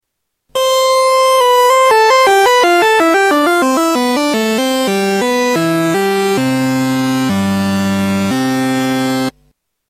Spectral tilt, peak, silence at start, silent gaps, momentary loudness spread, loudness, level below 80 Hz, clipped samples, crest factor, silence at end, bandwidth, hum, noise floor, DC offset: -4 dB/octave; -2 dBFS; 0.55 s; none; 6 LU; -12 LUFS; -52 dBFS; under 0.1%; 12 dB; 0.6 s; 16 kHz; none; -67 dBFS; under 0.1%